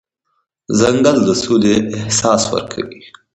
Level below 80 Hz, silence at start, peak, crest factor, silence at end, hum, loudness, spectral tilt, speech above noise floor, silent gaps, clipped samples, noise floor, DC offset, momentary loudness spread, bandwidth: -46 dBFS; 0.7 s; 0 dBFS; 16 dB; 0.25 s; none; -14 LUFS; -4.5 dB/octave; 54 dB; none; under 0.1%; -69 dBFS; under 0.1%; 12 LU; 10 kHz